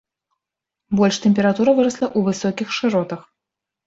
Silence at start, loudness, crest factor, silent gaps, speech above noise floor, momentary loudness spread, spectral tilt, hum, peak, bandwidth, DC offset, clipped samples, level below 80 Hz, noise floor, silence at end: 0.9 s; -19 LUFS; 16 dB; none; 67 dB; 8 LU; -5.5 dB/octave; none; -4 dBFS; 7.8 kHz; under 0.1%; under 0.1%; -60 dBFS; -85 dBFS; 0.65 s